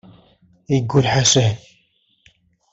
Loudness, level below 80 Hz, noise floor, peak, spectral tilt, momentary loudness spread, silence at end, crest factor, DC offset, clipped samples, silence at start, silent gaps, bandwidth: -17 LUFS; -50 dBFS; -62 dBFS; -2 dBFS; -4 dB/octave; 8 LU; 1.15 s; 18 dB; under 0.1%; under 0.1%; 0.7 s; none; 8 kHz